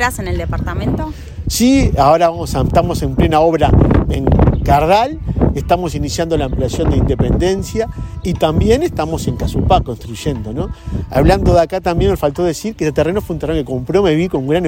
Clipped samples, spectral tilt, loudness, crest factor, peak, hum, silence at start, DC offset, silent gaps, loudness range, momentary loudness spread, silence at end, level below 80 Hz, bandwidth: under 0.1%; -6.5 dB/octave; -15 LUFS; 14 dB; 0 dBFS; none; 0 s; under 0.1%; none; 4 LU; 10 LU; 0 s; -24 dBFS; 16.5 kHz